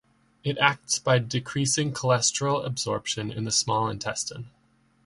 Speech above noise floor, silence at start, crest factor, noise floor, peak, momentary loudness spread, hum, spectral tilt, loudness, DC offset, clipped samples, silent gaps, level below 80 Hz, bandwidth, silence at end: 38 dB; 0.45 s; 24 dB; -64 dBFS; -4 dBFS; 9 LU; none; -3.5 dB/octave; -25 LUFS; under 0.1%; under 0.1%; none; -60 dBFS; 11.5 kHz; 0.55 s